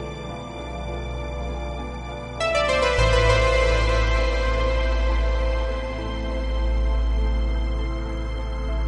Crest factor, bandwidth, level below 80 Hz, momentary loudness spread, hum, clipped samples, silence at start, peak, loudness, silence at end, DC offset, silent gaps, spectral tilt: 16 dB; 10 kHz; -24 dBFS; 13 LU; none; under 0.1%; 0 s; -6 dBFS; -24 LUFS; 0 s; under 0.1%; none; -5.5 dB/octave